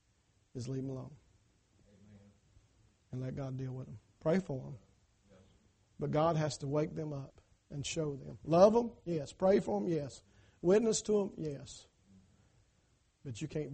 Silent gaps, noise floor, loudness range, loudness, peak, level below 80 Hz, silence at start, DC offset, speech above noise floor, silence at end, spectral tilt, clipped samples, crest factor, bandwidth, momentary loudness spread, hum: none; -73 dBFS; 14 LU; -34 LUFS; -12 dBFS; -64 dBFS; 0.55 s; under 0.1%; 39 dB; 0 s; -6 dB/octave; under 0.1%; 24 dB; 8.4 kHz; 21 LU; none